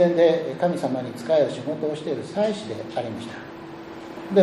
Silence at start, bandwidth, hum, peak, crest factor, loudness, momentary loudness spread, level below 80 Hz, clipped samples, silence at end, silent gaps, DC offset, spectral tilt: 0 s; 12 kHz; none; -4 dBFS; 18 dB; -24 LUFS; 18 LU; -64 dBFS; under 0.1%; 0 s; none; under 0.1%; -6.5 dB/octave